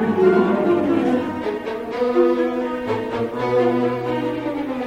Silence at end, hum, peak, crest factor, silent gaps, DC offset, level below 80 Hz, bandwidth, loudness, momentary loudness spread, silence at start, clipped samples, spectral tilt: 0 s; none; -4 dBFS; 16 dB; none; under 0.1%; -52 dBFS; 9 kHz; -20 LUFS; 9 LU; 0 s; under 0.1%; -7.5 dB/octave